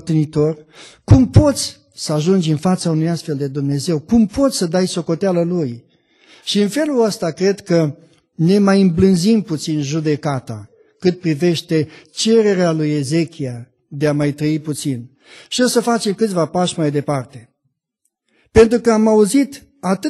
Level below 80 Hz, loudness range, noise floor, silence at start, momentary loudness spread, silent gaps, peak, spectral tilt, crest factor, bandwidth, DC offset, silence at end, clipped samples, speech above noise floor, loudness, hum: -38 dBFS; 3 LU; -71 dBFS; 0.05 s; 12 LU; none; 0 dBFS; -6 dB/octave; 16 dB; 12.5 kHz; under 0.1%; 0 s; under 0.1%; 56 dB; -17 LUFS; none